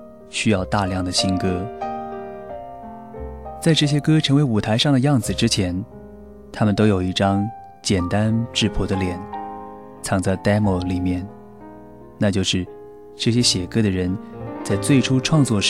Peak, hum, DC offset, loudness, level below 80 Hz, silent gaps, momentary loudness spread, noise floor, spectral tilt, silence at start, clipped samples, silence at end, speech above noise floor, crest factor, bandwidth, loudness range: -4 dBFS; none; 0.3%; -20 LUFS; -42 dBFS; none; 19 LU; -41 dBFS; -5 dB/octave; 0 s; under 0.1%; 0 s; 22 dB; 16 dB; 15 kHz; 4 LU